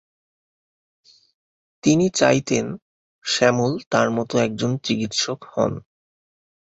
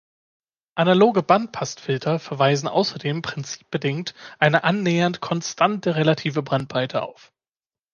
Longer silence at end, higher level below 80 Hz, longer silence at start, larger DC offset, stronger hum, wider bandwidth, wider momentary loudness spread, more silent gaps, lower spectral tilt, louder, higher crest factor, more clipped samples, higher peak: about the same, 0.9 s vs 0.8 s; first, -56 dBFS vs -64 dBFS; first, 1.85 s vs 0.75 s; neither; neither; first, 8.2 kHz vs 7.2 kHz; second, 8 LU vs 12 LU; first, 2.82-3.22 s, 3.87-3.91 s vs none; about the same, -4.5 dB/octave vs -5.5 dB/octave; about the same, -21 LUFS vs -21 LUFS; about the same, 20 dB vs 20 dB; neither; about the same, -2 dBFS vs -2 dBFS